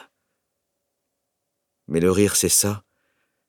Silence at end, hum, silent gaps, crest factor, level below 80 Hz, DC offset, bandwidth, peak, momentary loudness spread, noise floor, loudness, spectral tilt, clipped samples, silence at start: 0.7 s; none; none; 20 dB; -54 dBFS; under 0.1%; 19.5 kHz; -6 dBFS; 11 LU; -79 dBFS; -19 LUFS; -3.5 dB/octave; under 0.1%; 1.9 s